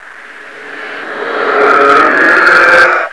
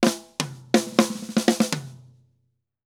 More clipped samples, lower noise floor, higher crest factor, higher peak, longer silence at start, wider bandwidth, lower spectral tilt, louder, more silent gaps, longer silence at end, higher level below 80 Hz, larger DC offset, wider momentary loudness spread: first, 1% vs under 0.1%; second, -31 dBFS vs -72 dBFS; second, 10 dB vs 24 dB; about the same, 0 dBFS vs 0 dBFS; about the same, 0.05 s vs 0 s; second, 11 kHz vs 17.5 kHz; about the same, -3 dB/octave vs -4 dB/octave; first, -6 LUFS vs -24 LUFS; neither; second, 0 s vs 0.9 s; first, -48 dBFS vs -72 dBFS; first, 0.6% vs under 0.1%; first, 19 LU vs 10 LU